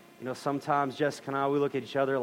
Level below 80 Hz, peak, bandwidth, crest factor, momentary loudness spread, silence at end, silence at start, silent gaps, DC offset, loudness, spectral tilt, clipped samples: -78 dBFS; -14 dBFS; 16 kHz; 16 dB; 5 LU; 0 s; 0.2 s; none; under 0.1%; -30 LUFS; -6 dB/octave; under 0.1%